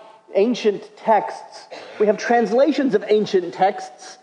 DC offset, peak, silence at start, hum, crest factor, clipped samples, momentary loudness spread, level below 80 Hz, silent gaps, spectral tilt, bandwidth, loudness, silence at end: under 0.1%; -4 dBFS; 0.3 s; none; 16 dB; under 0.1%; 19 LU; -80 dBFS; none; -5.5 dB/octave; 9.8 kHz; -19 LUFS; 0.1 s